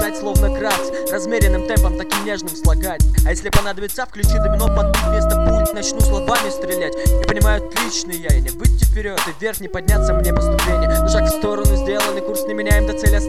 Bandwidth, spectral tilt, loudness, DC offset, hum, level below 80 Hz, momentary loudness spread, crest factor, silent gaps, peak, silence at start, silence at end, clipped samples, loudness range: 15 kHz; -5 dB/octave; -18 LUFS; 2%; none; -18 dBFS; 5 LU; 16 dB; none; 0 dBFS; 0 s; 0 s; under 0.1%; 1 LU